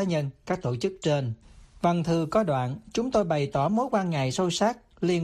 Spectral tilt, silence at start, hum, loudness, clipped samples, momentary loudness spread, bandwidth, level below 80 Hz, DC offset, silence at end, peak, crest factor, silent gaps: -6 dB/octave; 0 s; none; -27 LUFS; under 0.1%; 6 LU; 12.5 kHz; -54 dBFS; under 0.1%; 0 s; -10 dBFS; 16 dB; none